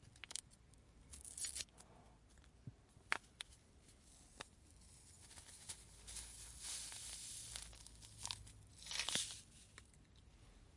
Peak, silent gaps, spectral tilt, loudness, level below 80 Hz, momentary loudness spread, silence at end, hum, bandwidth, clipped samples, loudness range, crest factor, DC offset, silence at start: -16 dBFS; none; -0.5 dB/octave; -48 LUFS; -68 dBFS; 22 LU; 0 s; none; 11.5 kHz; under 0.1%; 6 LU; 36 dB; under 0.1%; 0 s